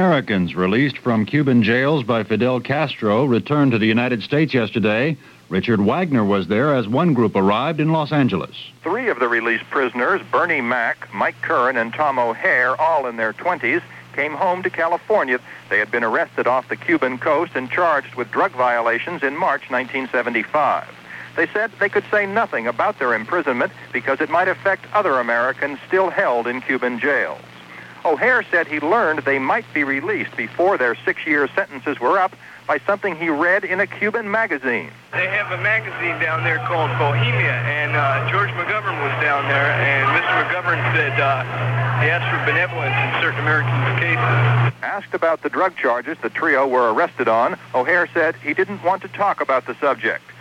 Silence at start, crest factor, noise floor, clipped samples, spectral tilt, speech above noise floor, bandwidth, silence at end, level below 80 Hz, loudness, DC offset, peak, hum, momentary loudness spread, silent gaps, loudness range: 0 s; 14 dB; -39 dBFS; under 0.1%; -7.5 dB/octave; 20 dB; 9.8 kHz; 0 s; -60 dBFS; -19 LUFS; under 0.1%; -4 dBFS; none; 5 LU; none; 2 LU